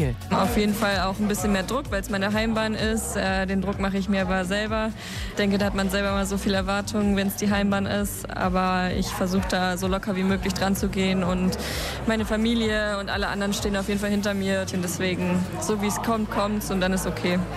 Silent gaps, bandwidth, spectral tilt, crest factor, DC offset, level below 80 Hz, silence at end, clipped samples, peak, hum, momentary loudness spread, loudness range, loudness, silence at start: none; 14.5 kHz; -5 dB/octave; 12 dB; under 0.1%; -38 dBFS; 0 s; under 0.1%; -12 dBFS; none; 3 LU; 1 LU; -25 LUFS; 0 s